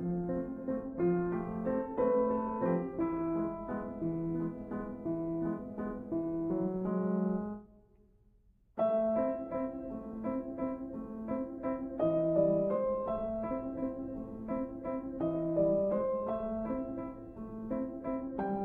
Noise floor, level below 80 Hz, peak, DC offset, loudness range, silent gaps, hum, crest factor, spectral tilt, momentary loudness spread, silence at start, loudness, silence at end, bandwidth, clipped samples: -66 dBFS; -56 dBFS; -18 dBFS; under 0.1%; 3 LU; none; none; 18 dB; -11.5 dB/octave; 10 LU; 0 s; -35 LUFS; 0 s; 3.6 kHz; under 0.1%